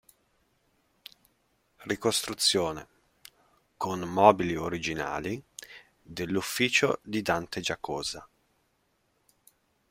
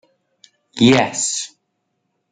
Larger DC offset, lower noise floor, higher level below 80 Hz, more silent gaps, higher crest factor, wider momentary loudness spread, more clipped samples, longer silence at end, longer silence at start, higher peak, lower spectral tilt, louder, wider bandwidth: neither; about the same, -73 dBFS vs -72 dBFS; about the same, -62 dBFS vs -58 dBFS; neither; first, 28 dB vs 18 dB; about the same, 21 LU vs 19 LU; neither; first, 1.65 s vs 0.85 s; first, 1.8 s vs 0.75 s; about the same, -4 dBFS vs -2 dBFS; about the same, -3.5 dB/octave vs -3.5 dB/octave; second, -28 LUFS vs -16 LUFS; first, 16 kHz vs 9.6 kHz